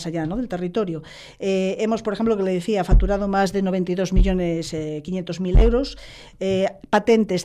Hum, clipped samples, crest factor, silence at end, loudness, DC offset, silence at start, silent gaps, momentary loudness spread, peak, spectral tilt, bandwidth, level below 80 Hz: none; under 0.1%; 14 dB; 0 s; -22 LUFS; under 0.1%; 0 s; none; 10 LU; -8 dBFS; -6.5 dB/octave; 10.5 kHz; -26 dBFS